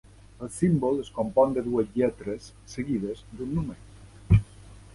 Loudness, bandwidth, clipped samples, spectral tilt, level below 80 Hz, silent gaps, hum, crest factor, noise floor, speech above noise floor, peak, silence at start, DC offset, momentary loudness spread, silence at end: -27 LUFS; 11.5 kHz; under 0.1%; -8 dB/octave; -42 dBFS; none; none; 20 dB; -48 dBFS; 21 dB; -6 dBFS; 0.4 s; under 0.1%; 15 LU; 0.05 s